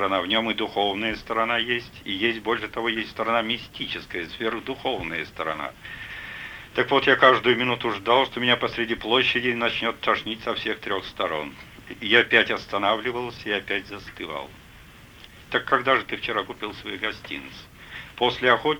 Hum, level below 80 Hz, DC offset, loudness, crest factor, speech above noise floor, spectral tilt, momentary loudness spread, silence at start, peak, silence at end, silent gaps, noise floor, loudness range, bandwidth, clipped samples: none; -54 dBFS; under 0.1%; -24 LUFS; 22 dB; 23 dB; -4.5 dB/octave; 15 LU; 0 s; -4 dBFS; 0 s; none; -47 dBFS; 7 LU; over 20 kHz; under 0.1%